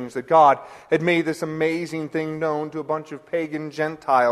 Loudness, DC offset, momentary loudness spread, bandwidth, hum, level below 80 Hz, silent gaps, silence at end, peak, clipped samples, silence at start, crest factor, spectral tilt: -22 LUFS; under 0.1%; 12 LU; 13.5 kHz; none; -66 dBFS; none; 0 s; -4 dBFS; under 0.1%; 0 s; 18 dB; -6 dB/octave